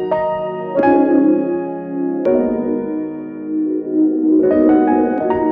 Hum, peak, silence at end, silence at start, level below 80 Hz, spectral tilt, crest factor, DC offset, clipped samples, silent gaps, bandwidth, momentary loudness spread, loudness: none; -2 dBFS; 0 s; 0 s; -50 dBFS; -10.5 dB/octave; 12 dB; under 0.1%; under 0.1%; none; 3.5 kHz; 10 LU; -16 LUFS